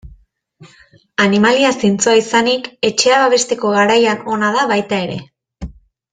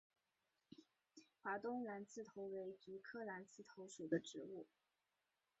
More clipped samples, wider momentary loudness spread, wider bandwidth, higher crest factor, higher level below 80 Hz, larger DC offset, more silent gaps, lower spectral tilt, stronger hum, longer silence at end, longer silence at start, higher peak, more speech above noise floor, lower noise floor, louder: neither; second, 15 LU vs 22 LU; first, 9.6 kHz vs 8 kHz; second, 16 dB vs 24 dB; first, -44 dBFS vs under -90 dBFS; neither; neither; about the same, -3.5 dB/octave vs -4.5 dB/octave; neither; second, 0.4 s vs 0.95 s; second, 0.05 s vs 0.7 s; first, 0 dBFS vs -28 dBFS; second, 35 dB vs 40 dB; second, -48 dBFS vs -90 dBFS; first, -14 LUFS vs -50 LUFS